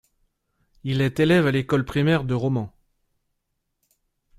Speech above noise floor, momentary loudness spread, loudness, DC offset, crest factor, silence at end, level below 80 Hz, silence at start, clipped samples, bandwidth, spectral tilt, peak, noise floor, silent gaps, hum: 56 dB; 10 LU; -22 LUFS; under 0.1%; 20 dB; 1.7 s; -52 dBFS; 0.85 s; under 0.1%; 14.5 kHz; -7.5 dB/octave; -4 dBFS; -77 dBFS; none; none